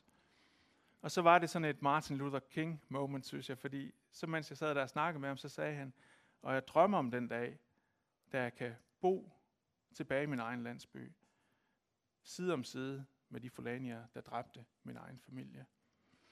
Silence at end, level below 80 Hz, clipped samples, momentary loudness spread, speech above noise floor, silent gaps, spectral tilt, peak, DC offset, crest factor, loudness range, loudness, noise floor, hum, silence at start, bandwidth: 0.7 s; -80 dBFS; under 0.1%; 20 LU; 47 dB; none; -6 dB/octave; -14 dBFS; under 0.1%; 26 dB; 10 LU; -38 LUFS; -86 dBFS; none; 1.05 s; 14.5 kHz